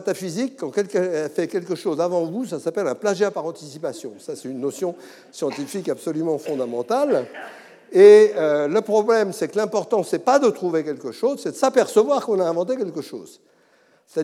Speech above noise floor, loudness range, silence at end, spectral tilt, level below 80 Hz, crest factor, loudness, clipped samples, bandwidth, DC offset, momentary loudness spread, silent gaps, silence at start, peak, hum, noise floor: 38 dB; 10 LU; 0 s; -5 dB/octave; -88 dBFS; 20 dB; -21 LUFS; under 0.1%; 13.5 kHz; under 0.1%; 14 LU; none; 0 s; -2 dBFS; none; -58 dBFS